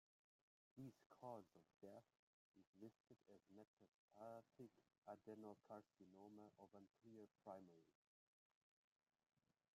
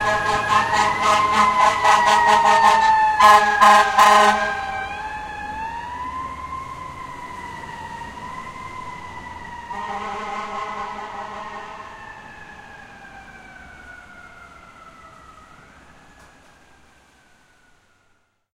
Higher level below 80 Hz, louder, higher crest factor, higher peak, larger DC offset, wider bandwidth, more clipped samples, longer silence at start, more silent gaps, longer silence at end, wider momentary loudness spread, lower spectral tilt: second, under -90 dBFS vs -48 dBFS; second, -64 LUFS vs -17 LUFS; about the same, 22 dB vs 20 dB; second, -44 dBFS vs 0 dBFS; neither; second, 11.5 kHz vs 16 kHz; neither; first, 0.75 s vs 0 s; first, 1.06-1.10 s, 2.19-2.54 s, 2.67-2.73 s, 3.00-3.04 s, 3.67-3.77 s, 3.88-4.08 s, 4.98-5.02 s vs none; second, 1.85 s vs 3.45 s; second, 8 LU vs 23 LU; first, -7.5 dB/octave vs -2 dB/octave